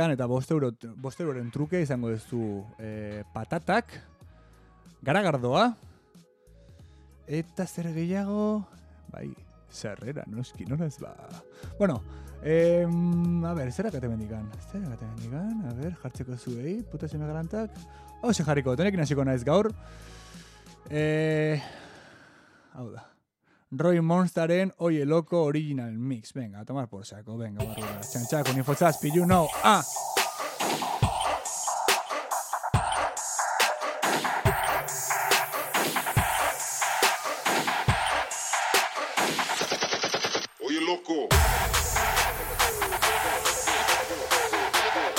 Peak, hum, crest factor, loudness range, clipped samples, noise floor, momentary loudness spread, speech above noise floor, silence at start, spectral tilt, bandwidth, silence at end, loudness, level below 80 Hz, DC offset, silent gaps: -6 dBFS; none; 22 dB; 8 LU; under 0.1%; -68 dBFS; 15 LU; 40 dB; 0 s; -4 dB/octave; 17 kHz; 0 s; -27 LUFS; -44 dBFS; under 0.1%; none